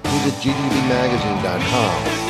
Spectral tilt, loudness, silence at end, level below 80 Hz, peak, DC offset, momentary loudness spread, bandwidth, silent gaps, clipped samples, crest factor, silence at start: -5 dB/octave; -19 LUFS; 0 s; -40 dBFS; -4 dBFS; under 0.1%; 2 LU; 15.5 kHz; none; under 0.1%; 16 dB; 0 s